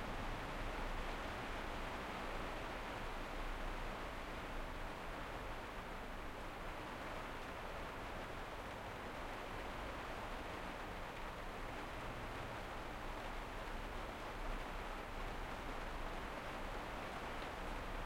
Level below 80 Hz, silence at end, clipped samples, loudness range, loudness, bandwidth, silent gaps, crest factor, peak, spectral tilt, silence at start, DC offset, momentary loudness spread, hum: -50 dBFS; 0 s; under 0.1%; 2 LU; -47 LUFS; 16.5 kHz; none; 14 dB; -32 dBFS; -4.5 dB/octave; 0 s; under 0.1%; 3 LU; none